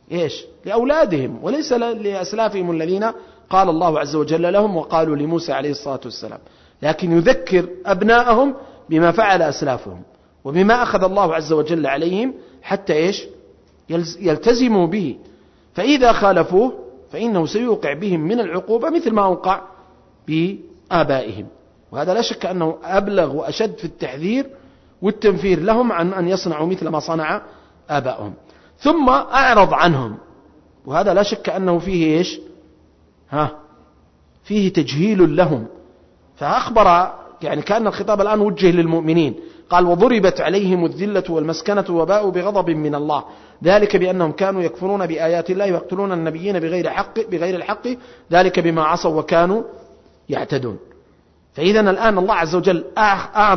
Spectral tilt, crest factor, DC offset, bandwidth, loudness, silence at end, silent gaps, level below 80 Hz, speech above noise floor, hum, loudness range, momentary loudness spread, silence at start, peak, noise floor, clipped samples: -6 dB/octave; 16 dB; under 0.1%; 6.4 kHz; -18 LUFS; 0 s; none; -44 dBFS; 37 dB; none; 4 LU; 12 LU; 0.1 s; -2 dBFS; -54 dBFS; under 0.1%